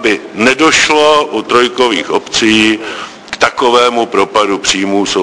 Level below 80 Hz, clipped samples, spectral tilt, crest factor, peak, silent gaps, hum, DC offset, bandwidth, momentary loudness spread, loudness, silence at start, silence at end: -46 dBFS; 0.4%; -2.5 dB/octave; 10 dB; 0 dBFS; none; none; under 0.1%; 10.5 kHz; 7 LU; -10 LUFS; 0 s; 0 s